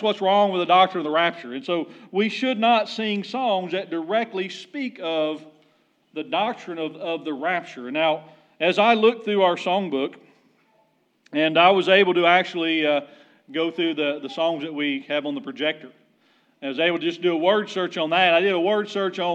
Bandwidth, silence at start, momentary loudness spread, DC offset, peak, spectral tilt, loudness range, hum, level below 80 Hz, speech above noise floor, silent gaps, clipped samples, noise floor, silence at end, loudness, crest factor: 8.8 kHz; 0 s; 13 LU; under 0.1%; -2 dBFS; -5.5 dB/octave; 7 LU; none; under -90 dBFS; 42 dB; none; under 0.1%; -64 dBFS; 0 s; -22 LUFS; 20 dB